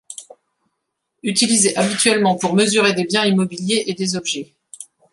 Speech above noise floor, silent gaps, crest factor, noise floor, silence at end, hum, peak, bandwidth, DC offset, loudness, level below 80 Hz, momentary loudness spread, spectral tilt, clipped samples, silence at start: 58 dB; none; 18 dB; -75 dBFS; 0.3 s; none; 0 dBFS; 11.5 kHz; under 0.1%; -17 LUFS; -64 dBFS; 21 LU; -3 dB/octave; under 0.1%; 0.1 s